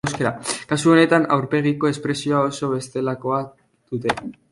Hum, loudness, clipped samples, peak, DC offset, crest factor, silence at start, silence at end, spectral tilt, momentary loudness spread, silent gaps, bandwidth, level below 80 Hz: none; -20 LUFS; under 0.1%; -2 dBFS; under 0.1%; 18 dB; 0.05 s; 0.2 s; -5.5 dB/octave; 11 LU; none; 11.5 kHz; -56 dBFS